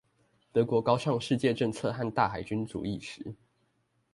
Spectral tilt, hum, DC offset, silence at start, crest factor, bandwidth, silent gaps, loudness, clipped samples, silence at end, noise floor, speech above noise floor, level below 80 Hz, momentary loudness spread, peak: -6.5 dB/octave; none; under 0.1%; 0.55 s; 20 dB; 11.5 kHz; none; -30 LUFS; under 0.1%; 0.8 s; -74 dBFS; 44 dB; -60 dBFS; 12 LU; -10 dBFS